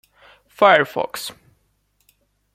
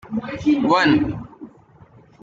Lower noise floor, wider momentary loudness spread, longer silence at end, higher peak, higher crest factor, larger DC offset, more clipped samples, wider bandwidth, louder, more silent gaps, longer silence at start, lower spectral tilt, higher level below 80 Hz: first, -66 dBFS vs -49 dBFS; about the same, 17 LU vs 17 LU; first, 1.25 s vs 0.75 s; about the same, -2 dBFS vs -4 dBFS; about the same, 20 dB vs 16 dB; neither; neither; first, 16 kHz vs 7.6 kHz; about the same, -17 LUFS vs -19 LUFS; neither; first, 0.6 s vs 0.05 s; second, -3.5 dB/octave vs -6 dB/octave; second, -66 dBFS vs -48 dBFS